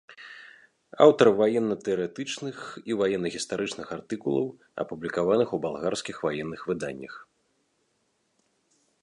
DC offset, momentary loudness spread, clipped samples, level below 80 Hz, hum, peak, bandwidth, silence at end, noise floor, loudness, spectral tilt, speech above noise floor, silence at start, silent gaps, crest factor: under 0.1%; 19 LU; under 0.1%; -66 dBFS; none; -4 dBFS; 11 kHz; 1.8 s; -73 dBFS; -27 LUFS; -5 dB/octave; 47 dB; 0.1 s; none; 22 dB